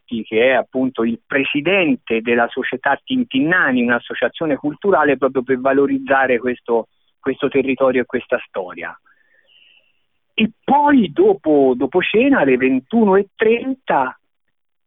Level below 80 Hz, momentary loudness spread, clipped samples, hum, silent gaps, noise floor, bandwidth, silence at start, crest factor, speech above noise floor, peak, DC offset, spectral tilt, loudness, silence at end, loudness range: -56 dBFS; 8 LU; under 0.1%; none; none; -77 dBFS; 3.9 kHz; 0.1 s; 14 dB; 61 dB; -4 dBFS; under 0.1%; -10.5 dB/octave; -17 LUFS; 0.75 s; 6 LU